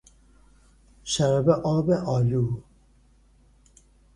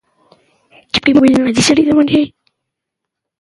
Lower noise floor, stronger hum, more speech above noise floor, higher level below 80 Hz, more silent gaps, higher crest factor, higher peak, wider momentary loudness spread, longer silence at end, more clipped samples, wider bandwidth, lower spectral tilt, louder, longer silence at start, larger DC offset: second, -58 dBFS vs -79 dBFS; neither; second, 36 dB vs 69 dB; second, -52 dBFS vs -46 dBFS; neither; first, 20 dB vs 14 dB; second, -6 dBFS vs 0 dBFS; about the same, 9 LU vs 7 LU; first, 1.55 s vs 1.1 s; neither; about the same, 11.5 kHz vs 11.5 kHz; first, -6.5 dB/octave vs -4 dB/octave; second, -24 LUFS vs -12 LUFS; about the same, 1.05 s vs 0.95 s; neither